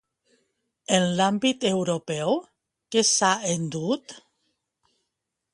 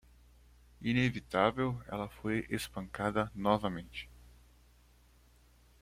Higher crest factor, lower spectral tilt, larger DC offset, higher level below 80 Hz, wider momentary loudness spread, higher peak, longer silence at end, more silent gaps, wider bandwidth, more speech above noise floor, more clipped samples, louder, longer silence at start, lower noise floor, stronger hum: about the same, 22 dB vs 24 dB; second, -3.5 dB/octave vs -6 dB/octave; neither; second, -68 dBFS vs -58 dBFS; about the same, 9 LU vs 11 LU; first, -6 dBFS vs -12 dBFS; second, 1.35 s vs 1.6 s; neither; second, 11.5 kHz vs 16 kHz; first, 58 dB vs 30 dB; neither; first, -24 LUFS vs -34 LUFS; about the same, 0.9 s vs 0.8 s; first, -82 dBFS vs -63 dBFS; second, none vs 60 Hz at -55 dBFS